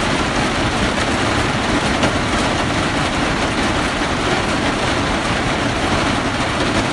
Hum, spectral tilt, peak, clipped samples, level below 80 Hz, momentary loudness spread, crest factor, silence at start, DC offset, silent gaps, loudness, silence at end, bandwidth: none; -4 dB/octave; -4 dBFS; under 0.1%; -30 dBFS; 1 LU; 14 dB; 0 s; under 0.1%; none; -17 LUFS; 0 s; 11.5 kHz